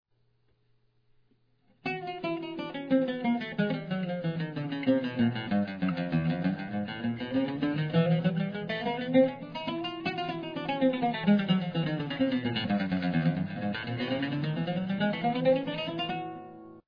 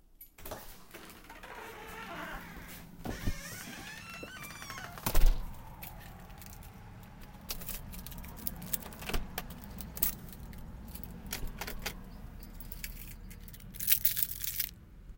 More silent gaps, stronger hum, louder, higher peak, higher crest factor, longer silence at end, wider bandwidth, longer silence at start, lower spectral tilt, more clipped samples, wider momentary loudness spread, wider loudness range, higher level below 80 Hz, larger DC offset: neither; neither; first, -30 LUFS vs -37 LUFS; second, -12 dBFS vs -6 dBFS; second, 18 dB vs 30 dB; about the same, 0.05 s vs 0 s; second, 5.2 kHz vs 17 kHz; first, 1.85 s vs 0.1 s; first, -9 dB/octave vs -3 dB/octave; neither; second, 8 LU vs 18 LU; second, 3 LU vs 10 LU; second, -64 dBFS vs -40 dBFS; neither